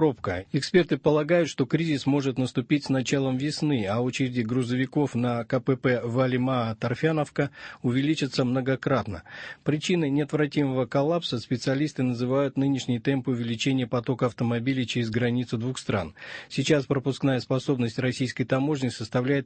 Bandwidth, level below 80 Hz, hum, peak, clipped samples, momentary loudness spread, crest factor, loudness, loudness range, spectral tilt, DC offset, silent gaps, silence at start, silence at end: 8.8 kHz; -60 dBFS; none; -8 dBFS; under 0.1%; 5 LU; 16 dB; -26 LUFS; 2 LU; -6.5 dB/octave; under 0.1%; none; 0 s; 0 s